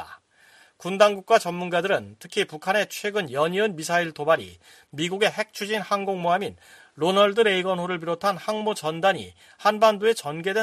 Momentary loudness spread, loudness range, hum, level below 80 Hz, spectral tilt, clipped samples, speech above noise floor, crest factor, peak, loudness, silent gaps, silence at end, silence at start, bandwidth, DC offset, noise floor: 10 LU; 2 LU; none; -70 dBFS; -4 dB/octave; under 0.1%; 32 dB; 20 dB; -4 dBFS; -24 LUFS; none; 0 s; 0 s; 15 kHz; under 0.1%; -56 dBFS